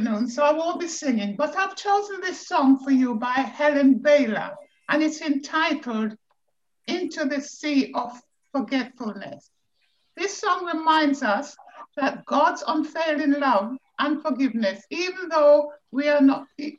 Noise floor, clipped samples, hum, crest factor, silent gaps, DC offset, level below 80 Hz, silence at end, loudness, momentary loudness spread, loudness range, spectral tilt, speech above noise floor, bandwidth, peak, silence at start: -80 dBFS; under 0.1%; none; 16 dB; none; under 0.1%; -74 dBFS; 0.05 s; -23 LUFS; 12 LU; 7 LU; -4 dB/octave; 58 dB; 7.8 kHz; -8 dBFS; 0 s